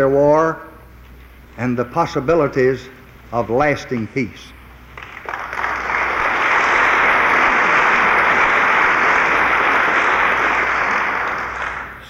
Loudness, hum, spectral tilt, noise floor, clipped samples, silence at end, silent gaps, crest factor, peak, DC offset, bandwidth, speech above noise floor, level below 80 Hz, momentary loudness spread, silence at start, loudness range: -15 LUFS; none; -5 dB/octave; -41 dBFS; under 0.1%; 0 s; none; 14 dB; -4 dBFS; under 0.1%; 16 kHz; 24 dB; -44 dBFS; 12 LU; 0 s; 8 LU